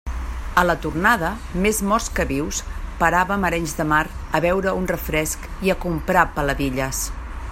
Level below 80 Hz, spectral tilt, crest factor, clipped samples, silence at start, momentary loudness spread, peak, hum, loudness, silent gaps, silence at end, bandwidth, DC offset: -32 dBFS; -4.5 dB/octave; 20 dB; under 0.1%; 0.05 s; 8 LU; 0 dBFS; none; -21 LUFS; none; 0 s; 16.5 kHz; under 0.1%